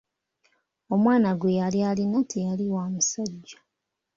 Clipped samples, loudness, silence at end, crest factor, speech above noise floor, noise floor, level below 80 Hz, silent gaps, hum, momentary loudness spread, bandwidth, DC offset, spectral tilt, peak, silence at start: under 0.1%; -25 LUFS; 0.65 s; 16 dB; 59 dB; -83 dBFS; -66 dBFS; none; none; 9 LU; 7.6 kHz; under 0.1%; -5.5 dB/octave; -10 dBFS; 0.9 s